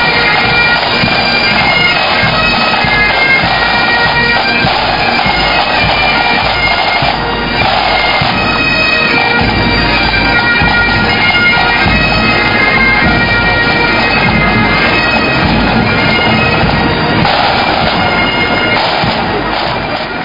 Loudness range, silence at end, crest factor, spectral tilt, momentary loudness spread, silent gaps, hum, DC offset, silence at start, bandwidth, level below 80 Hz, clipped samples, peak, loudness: 2 LU; 0 s; 10 dB; -5.5 dB/octave; 3 LU; none; none; 0.6%; 0 s; 6 kHz; -26 dBFS; 0.2%; 0 dBFS; -8 LUFS